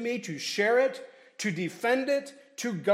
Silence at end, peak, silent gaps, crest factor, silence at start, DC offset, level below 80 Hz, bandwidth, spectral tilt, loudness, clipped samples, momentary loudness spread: 0 s; -12 dBFS; none; 18 dB; 0 s; under 0.1%; -86 dBFS; 16 kHz; -4 dB/octave; -29 LUFS; under 0.1%; 15 LU